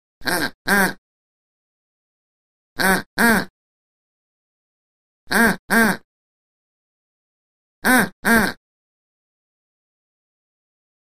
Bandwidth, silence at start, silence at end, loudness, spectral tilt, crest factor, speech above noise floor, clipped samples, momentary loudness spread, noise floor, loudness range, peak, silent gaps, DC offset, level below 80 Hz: 15.5 kHz; 0.25 s; 2.6 s; -18 LUFS; -3.5 dB/octave; 22 dB; over 72 dB; under 0.1%; 7 LU; under -90 dBFS; 3 LU; 0 dBFS; 0.54-0.65 s, 0.98-2.76 s, 3.06-3.17 s, 3.50-5.27 s, 5.59-5.68 s, 6.04-7.82 s, 8.13-8.23 s; 2%; -48 dBFS